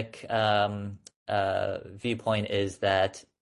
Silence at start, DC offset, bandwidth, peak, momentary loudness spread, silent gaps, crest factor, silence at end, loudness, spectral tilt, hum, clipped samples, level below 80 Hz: 0 s; under 0.1%; 11.5 kHz; -10 dBFS; 9 LU; 1.16-1.26 s; 20 dB; 0.2 s; -29 LUFS; -5.5 dB/octave; none; under 0.1%; -54 dBFS